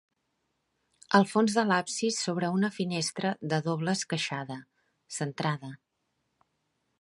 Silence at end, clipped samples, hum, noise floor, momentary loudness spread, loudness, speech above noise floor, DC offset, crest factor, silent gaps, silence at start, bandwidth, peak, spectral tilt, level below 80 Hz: 1.25 s; under 0.1%; none; -79 dBFS; 12 LU; -29 LUFS; 50 dB; under 0.1%; 26 dB; none; 1.1 s; 11.5 kHz; -6 dBFS; -4.5 dB/octave; -76 dBFS